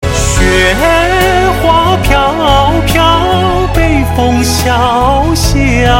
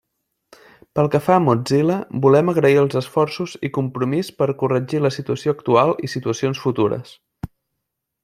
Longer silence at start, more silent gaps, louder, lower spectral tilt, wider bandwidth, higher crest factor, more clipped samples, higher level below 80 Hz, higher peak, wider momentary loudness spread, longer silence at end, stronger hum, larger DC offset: second, 0 s vs 0.95 s; neither; first, -9 LUFS vs -19 LUFS; second, -4.5 dB/octave vs -7 dB/octave; first, 17 kHz vs 15 kHz; second, 8 dB vs 18 dB; first, 1% vs under 0.1%; first, -16 dBFS vs -56 dBFS; about the same, 0 dBFS vs -2 dBFS; second, 2 LU vs 10 LU; second, 0 s vs 0.8 s; neither; neither